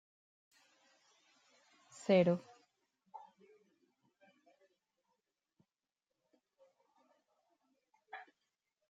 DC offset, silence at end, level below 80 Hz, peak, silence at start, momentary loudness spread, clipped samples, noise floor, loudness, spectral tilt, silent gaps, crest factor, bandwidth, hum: under 0.1%; 0.7 s; -88 dBFS; -20 dBFS; 2.1 s; 27 LU; under 0.1%; under -90 dBFS; -33 LUFS; -7 dB/octave; none; 24 dB; 9.2 kHz; none